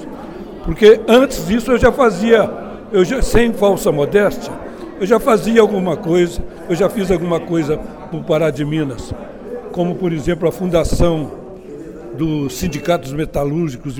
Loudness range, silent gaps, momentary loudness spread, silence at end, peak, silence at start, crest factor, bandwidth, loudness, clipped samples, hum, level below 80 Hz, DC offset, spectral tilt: 6 LU; none; 18 LU; 0 s; 0 dBFS; 0 s; 16 dB; 18 kHz; -16 LUFS; under 0.1%; none; -30 dBFS; under 0.1%; -6 dB/octave